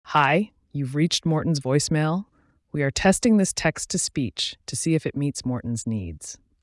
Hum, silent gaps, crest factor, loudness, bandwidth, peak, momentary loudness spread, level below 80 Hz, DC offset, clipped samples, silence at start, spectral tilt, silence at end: none; none; 18 dB; -24 LUFS; 12 kHz; -6 dBFS; 11 LU; -50 dBFS; under 0.1%; under 0.1%; 0.05 s; -4.5 dB/octave; 0.3 s